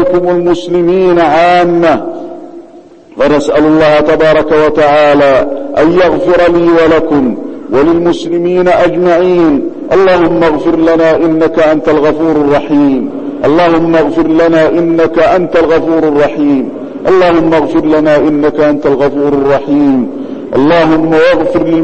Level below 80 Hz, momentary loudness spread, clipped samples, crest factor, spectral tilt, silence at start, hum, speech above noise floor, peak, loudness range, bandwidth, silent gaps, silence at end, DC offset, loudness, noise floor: -34 dBFS; 6 LU; under 0.1%; 8 dB; -7 dB/octave; 0 s; none; 27 dB; 0 dBFS; 2 LU; 8.4 kHz; none; 0 s; under 0.1%; -8 LUFS; -34 dBFS